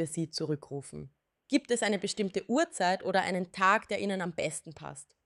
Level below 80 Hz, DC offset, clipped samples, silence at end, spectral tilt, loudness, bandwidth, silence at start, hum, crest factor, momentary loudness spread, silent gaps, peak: -70 dBFS; under 0.1%; under 0.1%; 0.2 s; -4 dB/octave; -31 LUFS; 12 kHz; 0 s; none; 20 dB; 16 LU; none; -12 dBFS